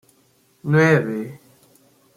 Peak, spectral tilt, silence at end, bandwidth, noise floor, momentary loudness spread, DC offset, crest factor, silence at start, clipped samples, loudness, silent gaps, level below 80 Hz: -2 dBFS; -7.5 dB/octave; 0.8 s; 15 kHz; -59 dBFS; 18 LU; under 0.1%; 20 dB; 0.65 s; under 0.1%; -18 LUFS; none; -64 dBFS